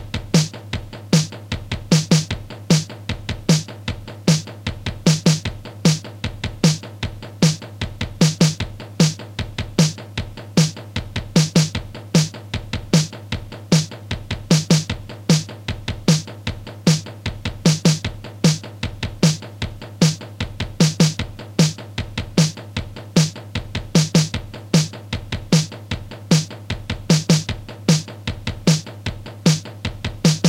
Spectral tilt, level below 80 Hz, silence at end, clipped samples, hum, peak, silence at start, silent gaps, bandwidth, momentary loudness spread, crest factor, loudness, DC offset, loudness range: -5 dB/octave; -38 dBFS; 0 s; under 0.1%; none; -2 dBFS; 0 s; none; 15.5 kHz; 13 LU; 18 dB; -21 LUFS; under 0.1%; 1 LU